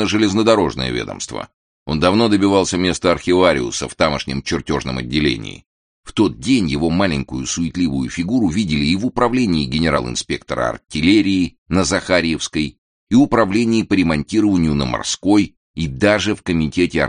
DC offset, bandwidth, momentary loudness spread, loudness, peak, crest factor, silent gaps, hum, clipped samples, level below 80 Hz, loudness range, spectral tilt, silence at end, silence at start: under 0.1%; 10 kHz; 9 LU; -17 LUFS; 0 dBFS; 16 dB; 1.54-1.86 s, 5.66-6.03 s, 11.58-11.66 s, 12.78-13.07 s, 15.57-15.74 s; none; under 0.1%; -38 dBFS; 3 LU; -5 dB/octave; 0 s; 0 s